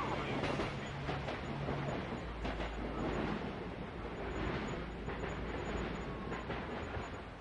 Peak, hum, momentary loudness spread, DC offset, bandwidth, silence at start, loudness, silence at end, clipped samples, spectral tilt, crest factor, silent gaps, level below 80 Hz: -24 dBFS; none; 5 LU; under 0.1%; 11 kHz; 0 s; -41 LUFS; 0 s; under 0.1%; -6.5 dB/octave; 16 dB; none; -48 dBFS